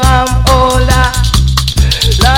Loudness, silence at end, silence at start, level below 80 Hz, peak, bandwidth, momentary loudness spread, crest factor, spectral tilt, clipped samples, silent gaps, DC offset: -10 LUFS; 0 s; 0 s; -12 dBFS; 0 dBFS; 17 kHz; 2 LU; 8 dB; -4 dB/octave; 0.2%; none; under 0.1%